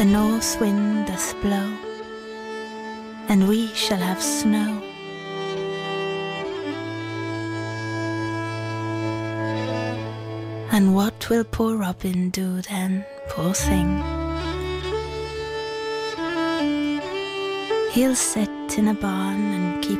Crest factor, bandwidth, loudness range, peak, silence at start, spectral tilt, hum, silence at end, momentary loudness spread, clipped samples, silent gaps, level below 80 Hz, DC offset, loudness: 14 dB; 16 kHz; 5 LU; -8 dBFS; 0 s; -5 dB/octave; none; 0 s; 12 LU; under 0.1%; none; -42 dBFS; under 0.1%; -24 LUFS